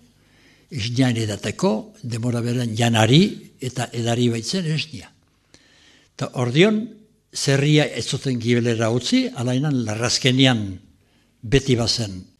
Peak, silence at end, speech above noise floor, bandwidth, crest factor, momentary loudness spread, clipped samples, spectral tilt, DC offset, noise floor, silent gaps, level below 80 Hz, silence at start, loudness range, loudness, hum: 0 dBFS; 0.15 s; 39 dB; 13.5 kHz; 22 dB; 14 LU; under 0.1%; -5 dB/octave; under 0.1%; -59 dBFS; none; -48 dBFS; 0.7 s; 3 LU; -20 LUFS; 50 Hz at -45 dBFS